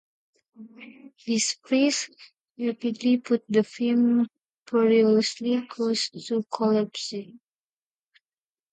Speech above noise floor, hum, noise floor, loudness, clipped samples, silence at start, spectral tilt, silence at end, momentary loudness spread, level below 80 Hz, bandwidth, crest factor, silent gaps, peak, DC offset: over 66 dB; none; under -90 dBFS; -25 LUFS; under 0.1%; 0.6 s; -4 dB/octave; 1.4 s; 11 LU; -78 dBFS; 9.4 kHz; 16 dB; 2.41-2.45 s, 4.54-4.66 s; -10 dBFS; under 0.1%